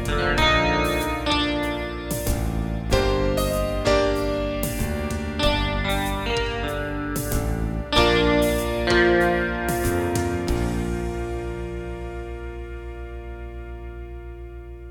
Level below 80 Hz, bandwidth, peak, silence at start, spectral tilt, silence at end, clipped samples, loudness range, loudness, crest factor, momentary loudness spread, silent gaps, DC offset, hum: -30 dBFS; 19 kHz; -4 dBFS; 0 s; -5 dB/octave; 0 s; under 0.1%; 10 LU; -23 LUFS; 18 dB; 18 LU; none; under 0.1%; none